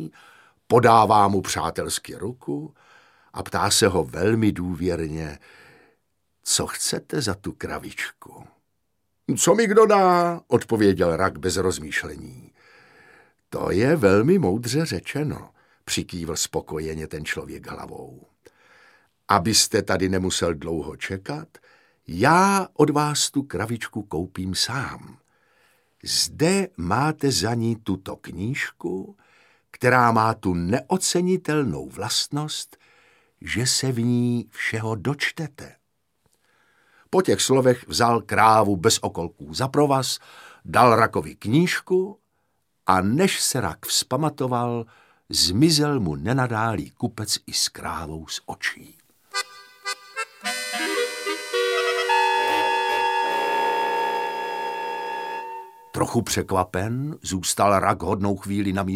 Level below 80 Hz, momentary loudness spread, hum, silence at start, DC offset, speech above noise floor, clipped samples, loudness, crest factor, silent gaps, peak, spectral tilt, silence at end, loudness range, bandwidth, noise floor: -52 dBFS; 15 LU; none; 0 s; under 0.1%; 54 dB; under 0.1%; -22 LUFS; 22 dB; none; -2 dBFS; -4 dB/octave; 0 s; 7 LU; 16.5 kHz; -76 dBFS